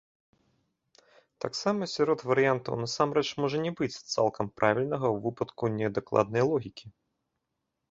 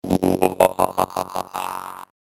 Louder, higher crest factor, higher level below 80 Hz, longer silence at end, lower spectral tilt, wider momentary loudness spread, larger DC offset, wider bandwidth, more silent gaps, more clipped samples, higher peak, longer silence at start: second, -29 LUFS vs -21 LUFS; about the same, 22 dB vs 20 dB; second, -66 dBFS vs -52 dBFS; first, 1 s vs 0.35 s; about the same, -5.5 dB/octave vs -5.5 dB/octave; second, 8 LU vs 15 LU; neither; second, 7.8 kHz vs 17 kHz; neither; neither; second, -8 dBFS vs 0 dBFS; first, 1.45 s vs 0.05 s